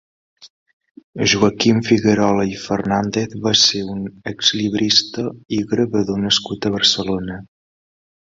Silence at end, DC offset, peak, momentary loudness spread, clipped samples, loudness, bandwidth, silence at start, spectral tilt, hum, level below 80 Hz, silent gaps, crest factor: 0.9 s; under 0.1%; 0 dBFS; 12 LU; under 0.1%; -17 LUFS; 7.8 kHz; 0.4 s; -4 dB/octave; none; -50 dBFS; 0.50-0.66 s, 0.73-0.80 s, 0.91-0.95 s, 1.04-1.13 s; 18 dB